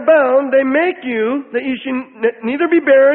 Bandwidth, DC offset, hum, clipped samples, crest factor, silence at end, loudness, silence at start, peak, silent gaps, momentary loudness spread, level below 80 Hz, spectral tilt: 4.1 kHz; under 0.1%; none; under 0.1%; 12 dB; 0 s; -15 LUFS; 0 s; 0 dBFS; none; 9 LU; -62 dBFS; -10 dB/octave